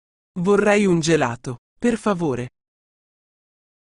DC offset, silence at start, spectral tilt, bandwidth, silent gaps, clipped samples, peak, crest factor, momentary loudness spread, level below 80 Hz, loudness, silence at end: under 0.1%; 0.35 s; -5.5 dB/octave; 11 kHz; 1.58-1.76 s; under 0.1%; -4 dBFS; 18 dB; 17 LU; -52 dBFS; -20 LUFS; 1.4 s